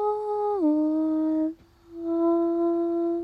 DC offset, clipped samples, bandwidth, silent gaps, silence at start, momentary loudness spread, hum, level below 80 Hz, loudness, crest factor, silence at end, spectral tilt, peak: under 0.1%; under 0.1%; 4.7 kHz; none; 0 s; 7 LU; none; -64 dBFS; -25 LUFS; 10 dB; 0 s; -8.5 dB/octave; -14 dBFS